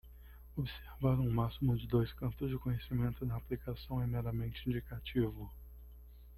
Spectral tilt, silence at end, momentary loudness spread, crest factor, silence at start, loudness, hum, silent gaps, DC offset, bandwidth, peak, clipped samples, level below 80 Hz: -9.5 dB/octave; 0 s; 22 LU; 18 dB; 0.05 s; -37 LUFS; none; none; under 0.1%; 13.5 kHz; -20 dBFS; under 0.1%; -50 dBFS